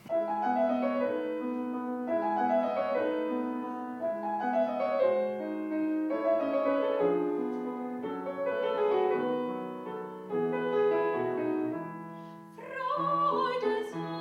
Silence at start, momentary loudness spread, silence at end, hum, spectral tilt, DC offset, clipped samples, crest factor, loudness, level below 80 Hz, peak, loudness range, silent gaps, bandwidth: 0.05 s; 9 LU; 0 s; none; -7.5 dB/octave; under 0.1%; under 0.1%; 14 dB; -31 LUFS; -82 dBFS; -16 dBFS; 2 LU; none; 10.5 kHz